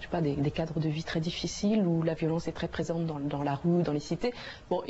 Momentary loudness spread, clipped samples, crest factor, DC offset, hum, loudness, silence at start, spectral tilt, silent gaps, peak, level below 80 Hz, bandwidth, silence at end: 6 LU; under 0.1%; 14 dB; under 0.1%; none; -31 LUFS; 0 s; -6.5 dB/octave; none; -18 dBFS; -52 dBFS; 8 kHz; 0 s